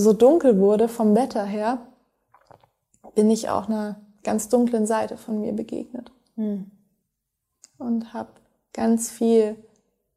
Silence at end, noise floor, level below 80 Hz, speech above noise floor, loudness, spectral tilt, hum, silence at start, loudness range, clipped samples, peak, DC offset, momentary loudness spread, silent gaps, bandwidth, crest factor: 0.6 s; -80 dBFS; -64 dBFS; 59 dB; -22 LUFS; -6 dB/octave; none; 0 s; 9 LU; under 0.1%; -4 dBFS; under 0.1%; 18 LU; none; 15 kHz; 18 dB